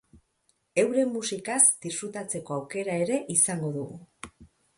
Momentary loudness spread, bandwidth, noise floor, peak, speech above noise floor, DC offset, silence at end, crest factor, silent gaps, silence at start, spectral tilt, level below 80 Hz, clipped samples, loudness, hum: 21 LU; 12 kHz; -72 dBFS; -6 dBFS; 45 dB; under 0.1%; 0.3 s; 22 dB; none; 0.15 s; -3.5 dB/octave; -66 dBFS; under 0.1%; -26 LUFS; none